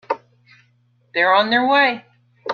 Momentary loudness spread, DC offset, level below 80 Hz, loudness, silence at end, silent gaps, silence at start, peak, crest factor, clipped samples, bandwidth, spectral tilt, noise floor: 16 LU; under 0.1%; -72 dBFS; -17 LUFS; 0 s; none; 0.1 s; -2 dBFS; 18 dB; under 0.1%; 6.8 kHz; -5 dB/octave; -60 dBFS